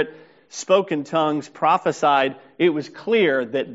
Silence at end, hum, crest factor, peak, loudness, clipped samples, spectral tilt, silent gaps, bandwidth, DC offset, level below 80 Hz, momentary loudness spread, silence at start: 0 s; none; 16 dB; -4 dBFS; -20 LUFS; under 0.1%; -3.5 dB/octave; none; 8 kHz; under 0.1%; -72 dBFS; 9 LU; 0 s